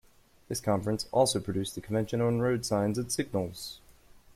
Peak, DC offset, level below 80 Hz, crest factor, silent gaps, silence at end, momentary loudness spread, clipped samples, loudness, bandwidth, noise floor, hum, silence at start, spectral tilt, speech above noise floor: -12 dBFS; under 0.1%; -58 dBFS; 18 dB; none; 0.45 s; 11 LU; under 0.1%; -30 LUFS; 16 kHz; -56 dBFS; none; 0.5 s; -5 dB/octave; 27 dB